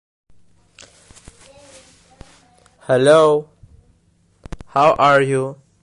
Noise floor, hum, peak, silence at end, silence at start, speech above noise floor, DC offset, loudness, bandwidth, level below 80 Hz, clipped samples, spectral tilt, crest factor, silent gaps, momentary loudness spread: -58 dBFS; none; -2 dBFS; 0.3 s; 2.9 s; 45 dB; under 0.1%; -15 LUFS; 11.5 kHz; -50 dBFS; under 0.1%; -5.5 dB/octave; 18 dB; none; 26 LU